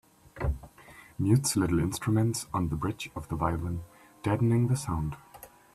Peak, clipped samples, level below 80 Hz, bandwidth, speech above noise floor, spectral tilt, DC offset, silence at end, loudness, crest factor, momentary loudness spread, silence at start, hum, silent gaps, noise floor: -12 dBFS; under 0.1%; -44 dBFS; 14 kHz; 25 dB; -6 dB/octave; under 0.1%; 0.3 s; -29 LUFS; 18 dB; 15 LU; 0.35 s; none; none; -53 dBFS